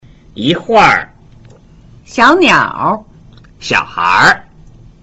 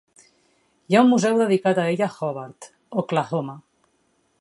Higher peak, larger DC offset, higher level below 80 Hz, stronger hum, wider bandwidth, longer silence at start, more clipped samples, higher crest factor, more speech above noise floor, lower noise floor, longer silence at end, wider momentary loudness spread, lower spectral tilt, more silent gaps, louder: about the same, 0 dBFS vs -2 dBFS; neither; first, -42 dBFS vs -74 dBFS; neither; about the same, 11.5 kHz vs 11.5 kHz; second, 0.35 s vs 0.9 s; neither; second, 14 dB vs 20 dB; second, 30 dB vs 46 dB; second, -40 dBFS vs -67 dBFS; second, 0.6 s vs 0.8 s; about the same, 13 LU vs 14 LU; second, -4 dB/octave vs -6 dB/octave; neither; first, -10 LUFS vs -21 LUFS